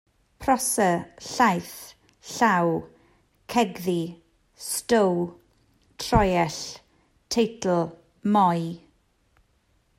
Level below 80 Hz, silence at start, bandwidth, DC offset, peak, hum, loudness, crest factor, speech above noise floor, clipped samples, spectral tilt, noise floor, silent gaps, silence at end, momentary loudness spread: -46 dBFS; 0.4 s; 16 kHz; under 0.1%; -4 dBFS; none; -24 LUFS; 22 dB; 43 dB; under 0.1%; -4.5 dB/octave; -66 dBFS; none; 1.2 s; 16 LU